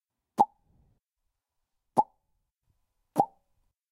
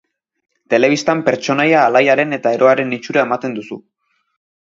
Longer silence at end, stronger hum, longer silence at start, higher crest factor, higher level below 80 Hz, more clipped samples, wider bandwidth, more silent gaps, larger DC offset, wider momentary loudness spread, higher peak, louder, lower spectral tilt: second, 0.65 s vs 0.9 s; neither; second, 0.4 s vs 0.7 s; first, 26 dB vs 16 dB; second, -74 dBFS vs -64 dBFS; neither; first, 15 kHz vs 7.6 kHz; neither; neither; second, 7 LU vs 12 LU; second, -8 dBFS vs 0 dBFS; second, -30 LUFS vs -14 LUFS; first, -7 dB/octave vs -5 dB/octave